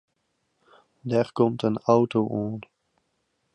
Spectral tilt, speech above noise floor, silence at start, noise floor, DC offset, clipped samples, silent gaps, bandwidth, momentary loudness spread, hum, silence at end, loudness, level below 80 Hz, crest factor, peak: -8 dB/octave; 51 dB; 1.05 s; -74 dBFS; under 0.1%; under 0.1%; none; 10 kHz; 13 LU; none; 0.95 s; -24 LUFS; -66 dBFS; 20 dB; -6 dBFS